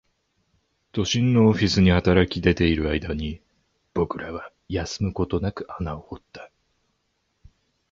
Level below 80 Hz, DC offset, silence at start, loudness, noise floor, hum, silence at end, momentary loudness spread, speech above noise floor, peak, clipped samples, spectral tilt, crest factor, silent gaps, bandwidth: -38 dBFS; under 0.1%; 0.95 s; -23 LUFS; -73 dBFS; none; 1.45 s; 19 LU; 51 dB; -4 dBFS; under 0.1%; -6 dB/octave; 22 dB; none; 7.6 kHz